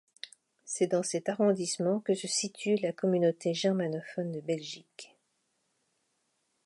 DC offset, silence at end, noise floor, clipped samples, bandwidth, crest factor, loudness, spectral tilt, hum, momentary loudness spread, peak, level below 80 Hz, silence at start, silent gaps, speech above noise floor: under 0.1%; 1.6 s; -77 dBFS; under 0.1%; 11.5 kHz; 18 dB; -31 LUFS; -4.5 dB/octave; none; 17 LU; -16 dBFS; -84 dBFS; 0.25 s; none; 47 dB